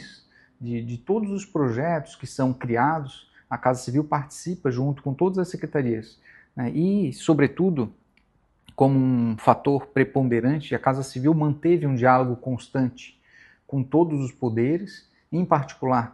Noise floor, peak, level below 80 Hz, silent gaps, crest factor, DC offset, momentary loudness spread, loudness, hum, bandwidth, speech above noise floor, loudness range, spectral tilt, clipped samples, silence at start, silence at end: -64 dBFS; 0 dBFS; -60 dBFS; none; 24 dB; under 0.1%; 11 LU; -24 LUFS; none; 12 kHz; 41 dB; 4 LU; -7.5 dB/octave; under 0.1%; 0 s; 0.05 s